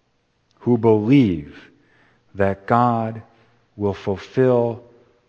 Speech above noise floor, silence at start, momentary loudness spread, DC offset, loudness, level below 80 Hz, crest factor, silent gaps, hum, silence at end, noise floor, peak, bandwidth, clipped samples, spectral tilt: 47 dB; 0.65 s; 13 LU; under 0.1%; -19 LUFS; -54 dBFS; 20 dB; none; none; 0.5 s; -66 dBFS; 0 dBFS; 7.2 kHz; under 0.1%; -9 dB/octave